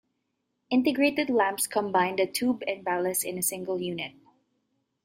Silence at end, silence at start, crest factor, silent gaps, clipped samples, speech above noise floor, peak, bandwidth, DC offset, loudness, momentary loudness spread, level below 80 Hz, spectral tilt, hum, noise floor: 0.95 s; 0.7 s; 18 dB; none; under 0.1%; 52 dB; -10 dBFS; 16 kHz; under 0.1%; -27 LUFS; 7 LU; -72 dBFS; -3.5 dB/octave; none; -79 dBFS